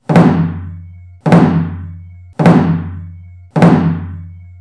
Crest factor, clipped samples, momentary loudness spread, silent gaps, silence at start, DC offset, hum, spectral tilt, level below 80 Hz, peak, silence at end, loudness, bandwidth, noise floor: 12 dB; under 0.1%; 21 LU; none; 0.1 s; under 0.1%; none; -9 dB/octave; -40 dBFS; 0 dBFS; 0.1 s; -12 LUFS; 11 kHz; -33 dBFS